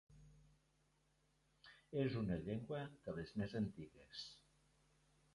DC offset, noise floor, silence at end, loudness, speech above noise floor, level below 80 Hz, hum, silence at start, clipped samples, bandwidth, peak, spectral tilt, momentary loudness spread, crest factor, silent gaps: under 0.1%; -79 dBFS; 0.95 s; -46 LUFS; 34 dB; -68 dBFS; none; 0.1 s; under 0.1%; 11 kHz; -28 dBFS; -7.5 dB/octave; 23 LU; 20 dB; none